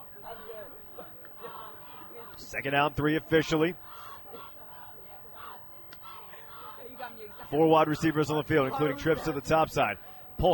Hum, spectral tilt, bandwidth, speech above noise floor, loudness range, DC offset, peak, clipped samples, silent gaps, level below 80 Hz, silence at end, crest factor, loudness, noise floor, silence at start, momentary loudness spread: none; -6 dB/octave; 17.5 kHz; 20 dB; 15 LU; under 0.1%; -10 dBFS; under 0.1%; none; -52 dBFS; 0 s; 20 dB; -27 LUFS; -47 dBFS; 0 s; 18 LU